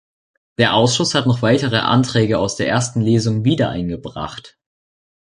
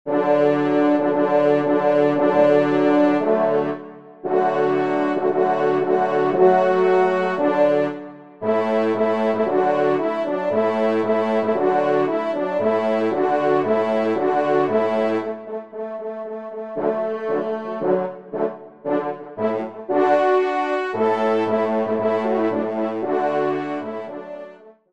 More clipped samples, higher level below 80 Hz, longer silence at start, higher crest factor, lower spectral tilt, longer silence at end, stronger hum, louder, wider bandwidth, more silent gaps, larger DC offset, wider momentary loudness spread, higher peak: neither; first, -46 dBFS vs -70 dBFS; first, 0.6 s vs 0.05 s; about the same, 16 dB vs 16 dB; second, -5 dB/octave vs -7.5 dB/octave; first, 0.75 s vs 0.2 s; neither; first, -17 LUFS vs -20 LUFS; first, 11 kHz vs 8.2 kHz; neither; second, under 0.1% vs 0.3%; about the same, 13 LU vs 12 LU; about the same, -2 dBFS vs -4 dBFS